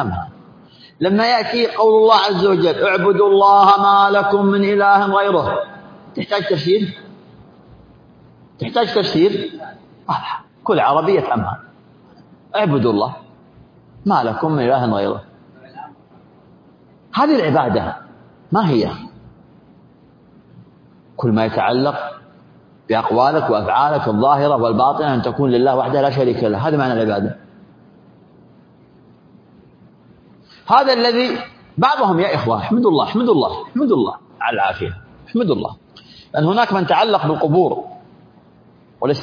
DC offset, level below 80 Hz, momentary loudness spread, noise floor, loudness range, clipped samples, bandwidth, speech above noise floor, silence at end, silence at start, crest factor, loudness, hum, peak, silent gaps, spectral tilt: under 0.1%; -54 dBFS; 14 LU; -48 dBFS; 10 LU; under 0.1%; 5.2 kHz; 33 dB; 0 s; 0 s; 16 dB; -16 LUFS; none; 0 dBFS; none; -7.5 dB/octave